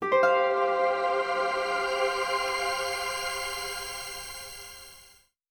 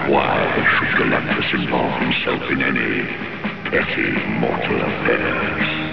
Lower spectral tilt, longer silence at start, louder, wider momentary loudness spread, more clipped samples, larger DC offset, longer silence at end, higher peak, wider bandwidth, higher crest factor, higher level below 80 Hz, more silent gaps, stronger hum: second, -1.5 dB/octave vs -7.5 dB/octave; about the same, 0 s vs 0 s; second, -28 LUFS vs -19 LUFS; first, 16 LU vs 5 LU; neither; second, under 0.1% vs 1%; first, 0.45 s vs 0 s; second, -12 dBFS vs -4 dBFS; first, over 20 kHz vs 5.4 kHz; about the same, 18 dB vs 16 dB; second, -58 dBFS vs -44 dBFS; neither; neither